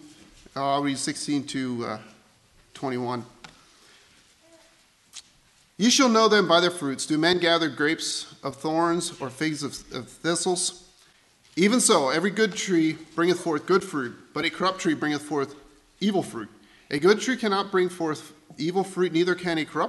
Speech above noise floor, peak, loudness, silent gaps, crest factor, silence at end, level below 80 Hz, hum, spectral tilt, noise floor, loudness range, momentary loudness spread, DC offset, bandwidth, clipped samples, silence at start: 36 dB; -6 dBFS; -24 LUFS; none; 20 dB; 0 s; -66 dBFS; none; -3.5 dB/octave; -60 dBFS; 11 LU; 16 LU; under 0.1%; 12.5 kHz; under 0.1%; 0.05 s